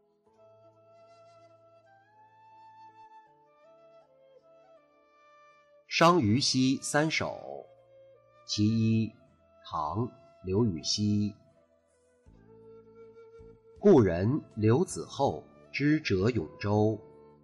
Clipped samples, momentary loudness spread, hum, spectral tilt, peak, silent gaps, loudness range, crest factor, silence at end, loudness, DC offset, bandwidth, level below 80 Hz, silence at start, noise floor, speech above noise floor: under 0.1%; 15 LU; none; -5.5 dB/octave; -12 dBFS; none; 6 LU; 20 dB; 0.45 s; -28 LUFS; under 0.1%; 11.5 kHz; -62 dBFS; 2.85 s; -68 dBFS; 41 dB